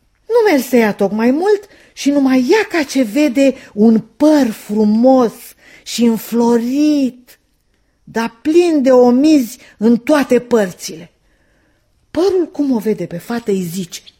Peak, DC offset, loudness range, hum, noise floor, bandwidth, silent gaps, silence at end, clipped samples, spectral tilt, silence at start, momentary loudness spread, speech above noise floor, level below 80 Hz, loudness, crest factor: 0 dBFS; under 0.1%; 4 LU; none; -59 dBFS; 16.5 kHz; none; 0.2 s; under 0.1%; -5.5 dB/octave; 0.3 s; 11 LU; 46 dB; -56 dBFS; -14 LUFS; 14 dB